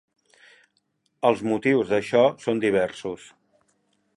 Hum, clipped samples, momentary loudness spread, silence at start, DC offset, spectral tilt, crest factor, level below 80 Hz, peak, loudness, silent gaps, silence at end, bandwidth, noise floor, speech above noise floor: none; under 0.1%; 13 LU; 1.25 s; under 0.1%; -6 dB/octave; 20 dB; -64 dBFS; -4 dBFS; -23 LUFS; none; 1 s; 11.5 kHz; -72 dBFS; 49 dB